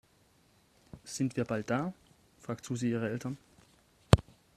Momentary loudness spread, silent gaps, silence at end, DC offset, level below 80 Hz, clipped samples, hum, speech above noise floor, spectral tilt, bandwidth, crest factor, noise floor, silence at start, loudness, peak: 16 LU; none; 0.35 s; under 0.1%; -48 dBFS; under 0.1%; none; 33 dB; -6 dB/octave; 14 kHz; 34 dB; -67 dBFS; 0.95 s; -33 LUFS; 0 dBFS